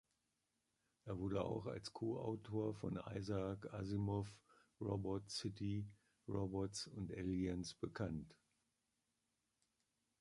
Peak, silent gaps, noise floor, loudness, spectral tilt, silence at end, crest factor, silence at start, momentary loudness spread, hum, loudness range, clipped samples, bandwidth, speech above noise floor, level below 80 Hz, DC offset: -26 dBFS; none; -88 dBFS; -46 LUFS; -6.5 dB/octave; 1.9 s; 20 dB; 1.05 s; 7 LU; none; 2 LU; under 0.1%; 11.5 kHz; 43 dB; -64 dBFS; under 0.1%